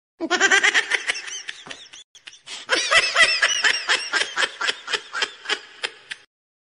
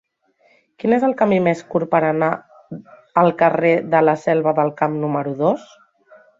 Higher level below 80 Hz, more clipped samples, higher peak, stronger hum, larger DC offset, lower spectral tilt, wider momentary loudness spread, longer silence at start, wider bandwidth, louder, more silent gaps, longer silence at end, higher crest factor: about the same, -62 dBFS vs -62 dBFS; neither; about the same, -4 dBFS vs -2 dBFS; neither; neither; second, 1 dB/octave vs -8 dB/octave; first, 21 LU vs 11 LU; second, 0.2 s vs 0.85 s; first, 11 kHz vs 7.6 kHz; about the same, -19 LUFS vs -18 LUFS; first, 2.04-2.15 s vs none; second, 0.5 s vs 0.75 s; about the same, 20 dB vs 18 dB